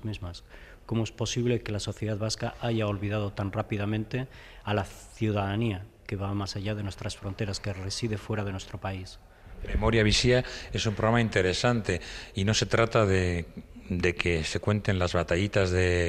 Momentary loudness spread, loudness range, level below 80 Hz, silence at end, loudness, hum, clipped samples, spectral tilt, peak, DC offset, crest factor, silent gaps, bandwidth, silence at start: 13 LU; 7 LU; -44 dBFS; 0 s; -29 LUFS; none; under 0.1%; -5 dB/octave; -6 dBFS; under 0.1%; 22 dB; none; 12.5 kHz; 0 s